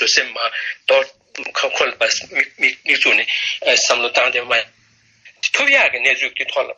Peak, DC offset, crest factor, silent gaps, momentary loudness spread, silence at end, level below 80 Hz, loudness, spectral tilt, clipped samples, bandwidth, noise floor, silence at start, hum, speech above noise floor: -2 dBFS; under 0.1%; 16 dB; none; 9 LU; 0.05 s; -64 dBFS; -16 LUFS; 1 dB/octave; under 0.1%; 9.4 kHz; -55 dBFS; 0 s; none; 38 dB